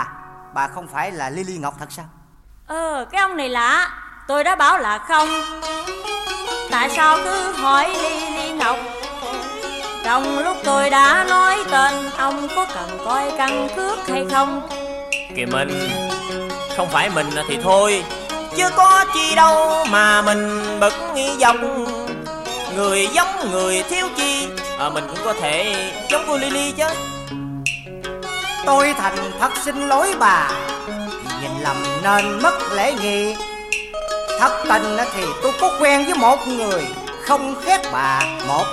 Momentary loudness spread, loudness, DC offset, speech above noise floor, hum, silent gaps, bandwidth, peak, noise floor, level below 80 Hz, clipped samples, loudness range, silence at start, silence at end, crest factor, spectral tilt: 12 LU; -18 LUFS; under 0.1%; 29 dB; none; none; 15.5 kHz; -2 dBFS; -46 dBFS; -46 dBFS; under 0.1%; 6 LU; 0 s; 0 s; 18 dB; -2.5 dB/octave